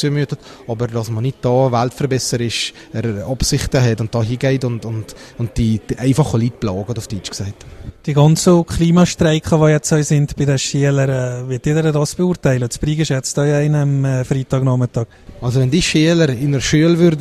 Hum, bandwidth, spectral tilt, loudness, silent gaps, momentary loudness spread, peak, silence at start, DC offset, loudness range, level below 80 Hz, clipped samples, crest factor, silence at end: none; 13.5 kHz; -6 dB/octave; -16 LUFS; none; 11 LU; 0 dBFS; 0 s; under 0.1%; 5 LU; -36 dBFS; under 0.1%; 16 dB; 0 s